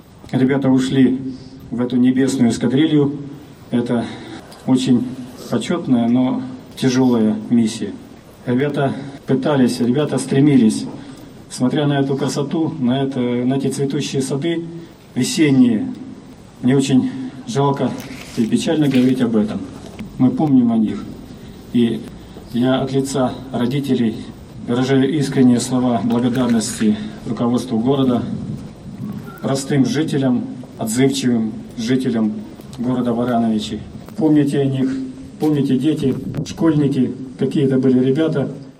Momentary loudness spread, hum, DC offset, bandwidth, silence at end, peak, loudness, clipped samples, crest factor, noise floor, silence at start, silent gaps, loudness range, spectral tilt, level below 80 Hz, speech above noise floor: 16 LU; none; under 0.1%; 13.5 kHz; 0.1 s; -2 dBFS; -18 LUFS; under 0.1%; 14 dB; -38 dBFS; 0.25 s; none; 3 LU; -6.5 dB/octave; -50 dBFS; 21 dB